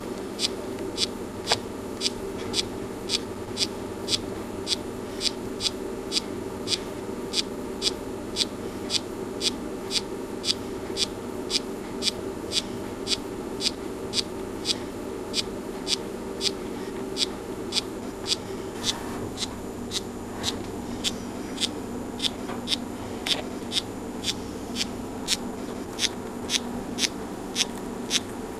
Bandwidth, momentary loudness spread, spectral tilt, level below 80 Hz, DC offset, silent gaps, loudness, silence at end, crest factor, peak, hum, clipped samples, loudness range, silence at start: 16 kHz; 7 LU; -2.5 dB/octave; -50 dBFS; under 0.1%; none; -29 LUFS; 0 s; 28 dB; -2 dBFS; none; under 0.1%; 2 LU; 0 s